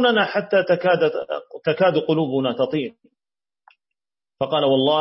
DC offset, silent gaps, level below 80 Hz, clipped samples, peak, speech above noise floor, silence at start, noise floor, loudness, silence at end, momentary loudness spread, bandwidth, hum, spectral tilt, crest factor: under 0.1%; none; -66 dBFS; under 0.1%; -6 dBFS; over 70 dB; 0 s; under -90 dBFS; -20 LUFS; 0 s; 10 LU; 5.8 kHz; none; -10 dB/octave; 16 dB